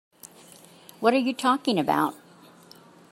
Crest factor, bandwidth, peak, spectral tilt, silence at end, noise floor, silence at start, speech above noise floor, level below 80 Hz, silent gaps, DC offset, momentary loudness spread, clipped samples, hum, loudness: 20 dB; 16 kHz; -8 dBFS; -4.5 dB/octave; 1 s; -52 dBFS; 1 s; 29 dB; -78 dBFS; none; under 0.1%; 15 LU; under 0.1%; none; -24 LUFS